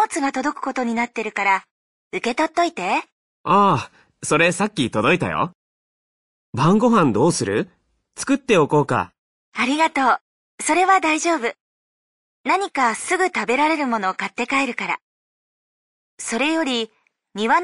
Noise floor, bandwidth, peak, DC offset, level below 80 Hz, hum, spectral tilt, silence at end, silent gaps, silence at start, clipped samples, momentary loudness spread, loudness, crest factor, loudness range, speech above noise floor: under -90 dBFS; 11.5 kHz; -4 dBFS; under 0.1%; -58 dBFS; none; -4.5 dB/octave; 0 s; 1.71-2.11 s, 3.12-3.44 s, 5.55-6.53 s, 9.18-9.52 s, 10.21-10.58 s, 11.60-12.44 s, 15.02-16.18 s; 0 s; under 0.1%; 11 LU; -20 LUFS; 16 dB; 3 LU; over 71 dB